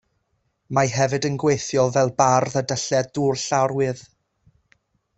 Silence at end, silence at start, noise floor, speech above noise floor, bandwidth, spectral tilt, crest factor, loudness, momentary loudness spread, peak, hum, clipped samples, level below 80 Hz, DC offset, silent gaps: 1.15 s; 0.7 s; -71 dBFS; 50 dB; 8.2 kHz; -4.5 dB/octave; 20 dB; -21 LUFS; 6 LU; -2 dBFS; none; under 0.1%; -58 dBFS; under 0.1%; none